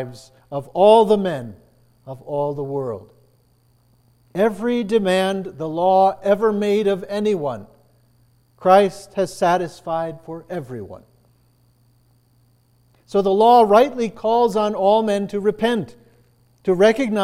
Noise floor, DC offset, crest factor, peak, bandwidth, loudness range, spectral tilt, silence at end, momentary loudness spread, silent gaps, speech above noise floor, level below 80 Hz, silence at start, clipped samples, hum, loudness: -59 dBFS; under 0.1%; 18 dB; -2 dBFS; 14.5 kHz; 10 LU; -6 dB/octave; 0 s; 18 LU; none; 40 dB; -58 dBFS; 0 s; under 0.1%; none; -18 LUFS